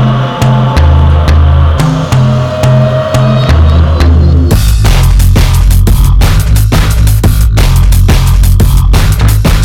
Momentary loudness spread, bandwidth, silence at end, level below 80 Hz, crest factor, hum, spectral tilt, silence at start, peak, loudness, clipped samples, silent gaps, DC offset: 2 LU; 17.5 kHz; 0 s; -8 dBFS; 4 dB; none; -6 dB/octave; 0 s; 0 dBFS; -7 LUFS; 3%; none; under 0.1%